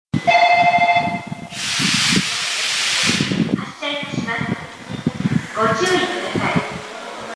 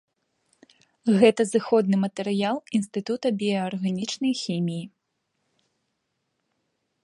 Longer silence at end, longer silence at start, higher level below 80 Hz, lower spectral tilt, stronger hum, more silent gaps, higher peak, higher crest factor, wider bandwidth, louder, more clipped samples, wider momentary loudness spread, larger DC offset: second, 0 s vs 2.15 s; second, 0.15 s vs 1.05 s; first, -52 dBFS vs -74 dBFS; second, -3.5 dB/octave vs -6 dB/octave; neither; neither; about the same, -4 dBFS vs -4 dBFS; second, 16 dB vs 22 dB; about the same, 11 kHz vs 11.5 kHz; first, -18 LUFS vs -24 LUFS; neither; first, 14 LU vs 10 LU; neither